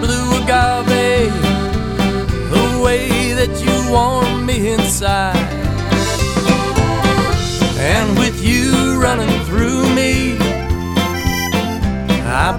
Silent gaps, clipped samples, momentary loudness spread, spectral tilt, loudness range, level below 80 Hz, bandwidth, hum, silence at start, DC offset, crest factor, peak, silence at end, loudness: none; under 0.1%; 4 LU; -5 dB/octave; 1 LU; -24 dBFS; 18 kHz; none; 0 s; under 0.1%; 14 dB; 0 dBFS; 0 s; -15 LUFS